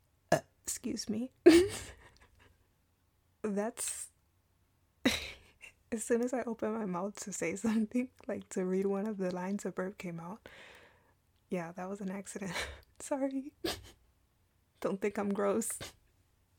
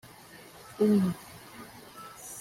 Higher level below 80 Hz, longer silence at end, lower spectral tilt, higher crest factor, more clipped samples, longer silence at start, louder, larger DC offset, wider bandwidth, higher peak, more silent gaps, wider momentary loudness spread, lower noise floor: about the same, -62 dBFS vs -66 dBFS; first, 0.65 s vs 0 s; second, -4.5 dB/octave vs -6.5 dB/octave; first, 26 dB vs 18 dB; neither; second, 0.3 s vs 0.7 s; second, -35 LUFS vs -28 LUFS; neither; first, 19 kHz vs 16 kHz; first, -8 dBFS vs -14 dBFS; neither; second, 13 LU vs 24 LU; first, -73 dBFS vs -51 dBFS